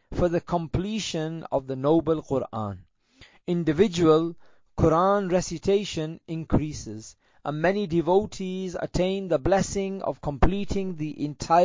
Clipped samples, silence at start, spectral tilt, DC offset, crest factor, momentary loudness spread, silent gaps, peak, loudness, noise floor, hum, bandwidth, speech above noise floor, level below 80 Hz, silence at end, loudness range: under 0.1%; 0.1 s; -6 dB/octave; under 0.1%; 20 dB; 12 LU; none; -6 dBFS; -26 LUFS; -55 dBFS; none; 7.6 kHz; 31 dB; -40 dBFS; 0 s; 3 LU